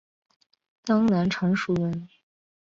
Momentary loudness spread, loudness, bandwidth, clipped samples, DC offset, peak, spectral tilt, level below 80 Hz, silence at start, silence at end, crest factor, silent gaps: 12 LU; -25 LUFS; 7.6 kHz; under 0.1%; under 0.1%; -10 dBFS; -7 dB/octave; -60 dBFS; 0.85 s; 0.55 s; 16 dB; none